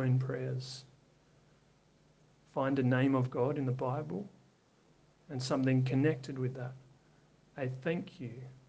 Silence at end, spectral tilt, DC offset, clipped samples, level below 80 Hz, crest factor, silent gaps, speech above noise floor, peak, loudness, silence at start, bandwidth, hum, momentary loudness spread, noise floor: 0.15 s; -7.5 dB/octave; under 0.1%; under 0.1%; -72 dBFS; 18 dB; none; 34 dB; -16 dBFS; -34 LUFS; 0 s; 8.8 kHz; none; 16 LU; -67 dBFS